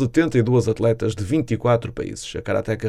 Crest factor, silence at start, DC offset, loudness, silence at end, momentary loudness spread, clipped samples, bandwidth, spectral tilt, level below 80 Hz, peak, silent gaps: 14 dB; 0 s; under 0.1%; -21 LUFS; 0 s; 11 LU; under 0.1%; 12 kHz; -7 dB/octave; -44 dBFS; -6 dBFS; none